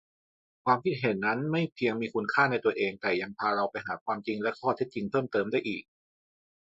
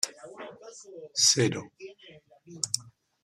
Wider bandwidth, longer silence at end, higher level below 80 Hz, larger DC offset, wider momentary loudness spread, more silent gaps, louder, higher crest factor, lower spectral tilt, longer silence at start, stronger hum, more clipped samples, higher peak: second, 7.8 kHz vs 15 kHz; first, 0.85 s vs 0.35 s; about the same, -70 dBFS vs -72 dBFS; neither; second, 7 LU vs 25 LU; first, 4.01-4.06 s vs none; second, -30 LUFS vs -26 LUFS; about the same, 20 dB vs 24 dB; first, -7.5 dB/octave vs -2 dB/octave; first, 0.65 s vs 0.05 s; neither; neither; about the same, -10 dBFS vs -8 dBFS